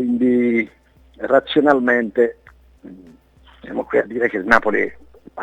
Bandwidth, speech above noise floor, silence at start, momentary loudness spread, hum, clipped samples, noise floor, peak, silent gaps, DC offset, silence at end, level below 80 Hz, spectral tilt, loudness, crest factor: 8 kHz; 32 dB; 0 s; 13 LU; none; under 0.1%; -49 dBFS; 0 dBFS; none; under 0.1%; 0 s; -50 dBFS; -6 dB/octave; -18 LUFS; 20 dB